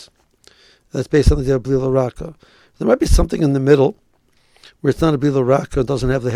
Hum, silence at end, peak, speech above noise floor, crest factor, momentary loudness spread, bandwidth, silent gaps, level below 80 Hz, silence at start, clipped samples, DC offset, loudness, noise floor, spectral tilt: none; 0 s; 0 dBFS; 42 dB; 18 dB; 10 LU; 15 kHz; none; -26 dBFS; 0 s; under 0.1%; under 0.1%; -17 LUFS; -57 dBFS; -7 dB/octave